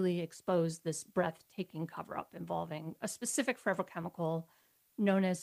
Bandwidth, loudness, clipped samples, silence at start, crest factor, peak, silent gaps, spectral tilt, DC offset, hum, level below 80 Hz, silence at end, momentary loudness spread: 15.5 kHz; -37 LUFS; under 0.1%; 0 s; 18 dB; -18 dBFS; none; -5 dB/octave; under 0.1%; none; -76 dBFS; 0 s; 10 LU